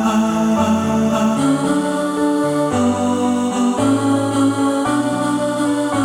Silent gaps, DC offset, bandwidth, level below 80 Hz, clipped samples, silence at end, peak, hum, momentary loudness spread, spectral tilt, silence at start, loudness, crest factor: none; under 0.1%; 15.5 kHz; -50 dBFS; under 0.1%; 0 s; -4 dBFS; none; 2 LU; -5.5 dB/octave; 0 s; -17 LUFS; 12 dB